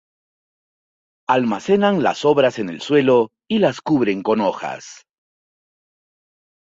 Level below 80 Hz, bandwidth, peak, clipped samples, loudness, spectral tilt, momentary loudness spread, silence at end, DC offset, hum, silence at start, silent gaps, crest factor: -62 dBFS; 7.8 kHz; -2 dBFS; under 0.1%; -18 LUFS; -6 dB/octave; 12 LU; 1.75 s; under 0.1%; none; 1.3 s; none; 18 dB